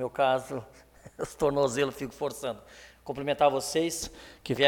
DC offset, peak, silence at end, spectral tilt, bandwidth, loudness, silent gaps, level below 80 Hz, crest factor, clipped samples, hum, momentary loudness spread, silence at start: under 0.1%; -6 dBFS; 0 s; -4 dB/octave; 18.5 kHz; -30 LUFS; none; -56 dBFS; 22 dB; under 0.1%; none; 14 LU; 0 s